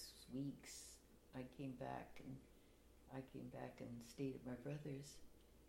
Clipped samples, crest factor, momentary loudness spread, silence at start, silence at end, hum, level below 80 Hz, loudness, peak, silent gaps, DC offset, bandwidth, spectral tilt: under 0.1%; 18 dB; 10 LU; 0 s; 0 s; none; -72 dBFS; -54 LUFS; -36 dBFS; none; under 0.1%; 16.5 kHz; -5.5 dB/octave